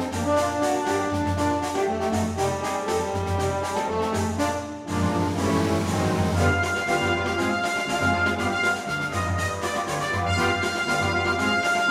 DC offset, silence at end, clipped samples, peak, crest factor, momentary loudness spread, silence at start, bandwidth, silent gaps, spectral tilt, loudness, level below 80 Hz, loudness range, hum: under 0.1%; 0 s; under 0.1%; -8 dBFS; 16 dB; 4 LU; 0 s; 16 kHz; none; -5 dB/octave; -24 LUFS; -46 dBFS; 2 LU; none